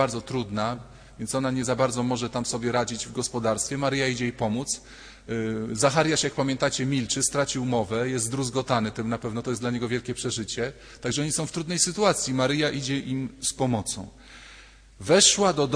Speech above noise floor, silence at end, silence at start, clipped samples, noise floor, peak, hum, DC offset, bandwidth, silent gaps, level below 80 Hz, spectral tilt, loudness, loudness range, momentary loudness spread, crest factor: 24 dB; 0 s; 0 s; under 0.1%; -49 dBFS; -4 dBFS; none; under 0.1%; 11 kHz; none; -52 dBFS; -3.5 dB/octave; -25 LUFS; 3 LU; 9 LU; 22 dB